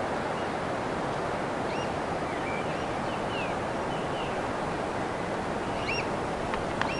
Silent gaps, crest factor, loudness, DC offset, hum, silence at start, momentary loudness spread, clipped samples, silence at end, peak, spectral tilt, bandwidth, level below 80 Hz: none; 22 dB; -31 LUFS; under 0.1%; none; 0 s; 2 LU; under 0.1%; 0 s; -8 dBFS; -5 dB/octave; 11.5 kHz; -50 dBFS